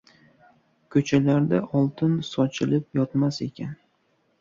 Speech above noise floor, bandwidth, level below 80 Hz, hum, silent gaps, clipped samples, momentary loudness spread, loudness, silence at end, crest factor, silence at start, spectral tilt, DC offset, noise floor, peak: 45 dB; 7.6 kHz; -62 dBFS; none; none; under 0.1%; 11 LU; -24 LUFS; 0.65 s; 18 dB; 0.9 s; -7.5 dB/octave; under 0.1%; -68 dBFS; -6 dBFS